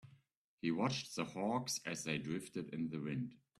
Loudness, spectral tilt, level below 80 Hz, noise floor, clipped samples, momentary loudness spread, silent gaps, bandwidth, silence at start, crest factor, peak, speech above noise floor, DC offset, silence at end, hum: -41 LUFS; -4.5 dB/octave; -76 dBFS; -73 dBFS; under 0.1%; 6 LU; 0.37-0.58 s; 13.5 kHz; 0.05 s; 18 dB; -24 dBFS; 32 dB; under 0.1%; 0.25 s; none